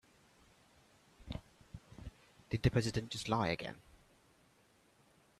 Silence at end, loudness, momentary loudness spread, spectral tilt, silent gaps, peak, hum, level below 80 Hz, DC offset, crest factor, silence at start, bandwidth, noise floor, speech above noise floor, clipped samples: 1.6 s; -38 LUFS; 24 LU; -5.5 dB/octave; none; -18 dBFS; none; -56 dBFS; under 0.1%; 24 dB; 1.2 s; 13 kHz; -70 dBFS; 34 dB; under 0.1%